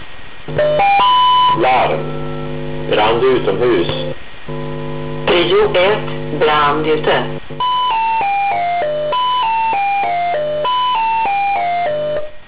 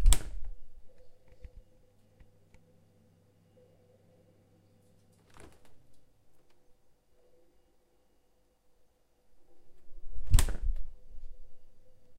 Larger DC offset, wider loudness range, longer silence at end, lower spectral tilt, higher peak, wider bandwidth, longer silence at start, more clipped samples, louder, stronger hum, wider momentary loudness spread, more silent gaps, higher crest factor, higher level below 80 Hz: first, 5% vs under 0.1%; second, 3 LU vs 25 LU; about the same, 0 s vs 0 s; first, -9 dB/octave vs -3.5 dB/octave; second, -6 dBFS vs -2 dBFS; second, 4 kHz vs 16 kHz; about the same, 0 s vs 0 s; neither; first, -15 LUFS vs -34 LUFS; neither; second, 13 LU vs 28 LU; neither; second, 10 dB vs 30 dB; second, -42 dBFS vs -36 dBFS